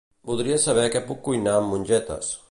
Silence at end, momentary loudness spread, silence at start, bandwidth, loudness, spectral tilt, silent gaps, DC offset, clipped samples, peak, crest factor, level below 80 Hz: 0.15 s; 9 LU; 0.25 s; 11.5 kHz; -23 LUFS; -4 dB/octave; none; under 0.1%; under 0.1%; -8 dBFS; 16 dB; -52 dBFS